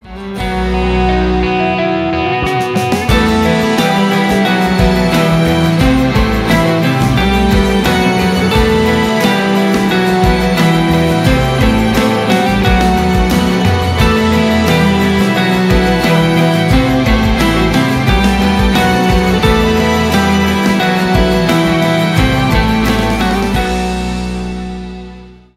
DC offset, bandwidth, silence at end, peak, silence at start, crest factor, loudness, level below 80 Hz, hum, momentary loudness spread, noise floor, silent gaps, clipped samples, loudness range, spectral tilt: under 0.1%; 16 kHz; 0.25 s; 0 dBFS; 0.05 s; 12 dB; -11 LUFS; -22 dBFS; none; 4 LU; -33 dBFS; none; under 0.1%; 2 LU; -6 dB/octave